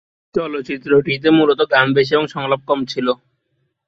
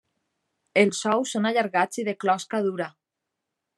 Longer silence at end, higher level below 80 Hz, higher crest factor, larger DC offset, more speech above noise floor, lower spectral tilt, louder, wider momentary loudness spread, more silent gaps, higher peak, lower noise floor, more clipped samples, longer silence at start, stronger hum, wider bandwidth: second, 0.75 s vs 0.9 s; first, -56 dBFS vs -80 dBFS; second, 16 dB vs 22 dB; neither; second, 53 dB vs 60 dB; first, -6.5 dB/octave vs -4 dB/octave; first, -17 LUFS vs -24 LUFS; first, 10 LU vs 6 LU; neither; first, -2 dBFS vs -6 dBFS; second, -69 dBFS vs -84 dBFS; neither; second, 0.35 s vs 0.75 s; neither; second, 7.4 kHz vs 12.5 kHz